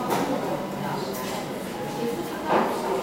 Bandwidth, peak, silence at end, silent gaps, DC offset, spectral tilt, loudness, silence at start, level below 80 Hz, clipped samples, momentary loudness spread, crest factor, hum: 16 kHz; -10 dBFS; 0 s; none; under 0.1%; -5 dB/octave; -28 LUFS; 0 s; -58 dBFS; under 0.1%; 7 LU; 16 dB; none